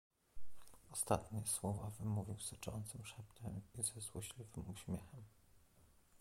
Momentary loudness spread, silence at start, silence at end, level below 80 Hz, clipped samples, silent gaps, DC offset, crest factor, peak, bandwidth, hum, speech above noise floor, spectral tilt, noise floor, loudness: 13 LU; 0.15 s; 0 s; -64 dBFS; under 0.1%; none; under 0.1%; 26 dB; -20 dBFS; 16.5 kHz; none; 24 dB; -4.5 dB/octave; -70 dBFS; -45 LUFS